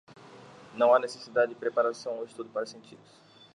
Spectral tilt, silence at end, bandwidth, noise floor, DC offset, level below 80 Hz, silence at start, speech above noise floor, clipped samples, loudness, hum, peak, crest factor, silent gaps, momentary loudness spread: -4 dB/octave; 0.6 s; 11 kHz; -51 dBFS; under 0.1%; -80 dBFS; 0.35 s; 22 dB; under 0.1%; -28 LUFS; none; -10 dBFS; 20 dB; none; 16 LU